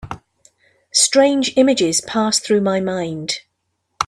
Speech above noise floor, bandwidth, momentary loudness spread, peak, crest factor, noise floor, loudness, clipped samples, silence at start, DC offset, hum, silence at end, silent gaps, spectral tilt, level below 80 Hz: 55 dB; 14 kHz; 12 LU; 0 dBFS; 18 dB; -72 dBFS; -16 LUFS; under 0.1%; 0.05 s; under 0.1%; none; 0 s; none; -3 dB/octave; -54 dBFS